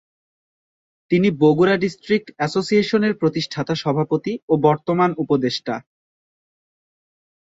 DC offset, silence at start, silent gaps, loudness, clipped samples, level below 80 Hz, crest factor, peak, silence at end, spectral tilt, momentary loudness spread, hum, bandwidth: under 0.1%; 1.1 s; 4.42-4.48 s; -19 LUFS; under 0.1%; -60 dBFS; 18 dB; -2 dBFS; 1.6 s; -6.5 dB/octave; 8 LU; none; 8 kHz